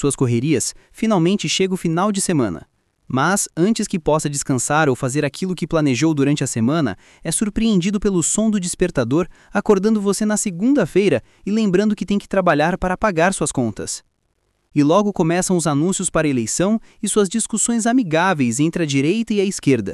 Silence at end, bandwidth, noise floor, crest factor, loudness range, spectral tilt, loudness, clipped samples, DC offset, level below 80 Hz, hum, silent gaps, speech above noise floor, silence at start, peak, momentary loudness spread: 0 s; 13.5 kHz; -67 dBFS; 16 dB; 1 LU; -5 dB/octave; -18 LUFS; under 0.1%; under 0.1%; -44 dBFS; none; none; 49 dB; 0 s; -4 dBFS; 6 LU